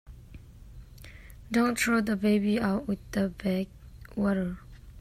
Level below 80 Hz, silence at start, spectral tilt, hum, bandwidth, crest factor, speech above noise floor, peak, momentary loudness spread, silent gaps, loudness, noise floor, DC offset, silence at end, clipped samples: -50 dBFS; 0.05 s; -5.5 dB/octave; none; 15 kHz; 16 dB; 21 dB; -14 dBFS; 23 LU; none; -28 LUFS; -48 dBFS; under 0.1%; 0 s; under 0.1%